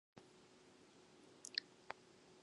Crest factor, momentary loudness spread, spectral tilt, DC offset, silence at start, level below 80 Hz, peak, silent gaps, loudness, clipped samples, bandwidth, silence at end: 36 dB; 20 LU; -1 dB/octave; under 0.1%; 0.15 s; under -90 dBFS; -20 dBFS; none; -50 LUFS; under 0.1%; 11 kHz; 0 s